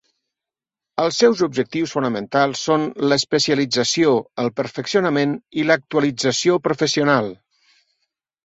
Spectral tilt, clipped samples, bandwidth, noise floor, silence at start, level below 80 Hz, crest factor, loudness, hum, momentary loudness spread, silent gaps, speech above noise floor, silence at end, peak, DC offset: -4 dB/octave; under 0.1%; 8 kHz; -88 dBFS; 0.95 s; -62 dBFS; 18 dB; -19 LUFS; none; 6 LU; none; 69 dB; 1.1 s; -2 dBFS; under 0.1%